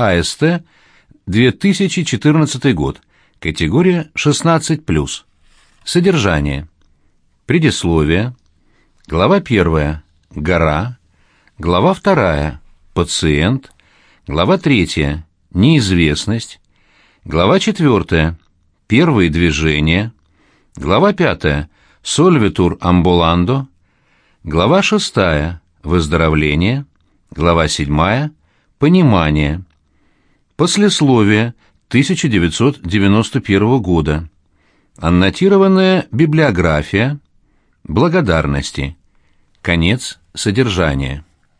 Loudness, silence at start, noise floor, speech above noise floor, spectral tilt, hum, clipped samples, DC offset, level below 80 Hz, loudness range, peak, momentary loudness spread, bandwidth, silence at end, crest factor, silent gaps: -14 LUFS; 0 s; -57 dBFS; 44 dB; -5.5 dB/octave; none; under 0.1%; under 0.1%; -30 dBFS; 3 LU; 0 dBFS; 12 LU; 10.5 kHz; 0.4 s; 14 dB; none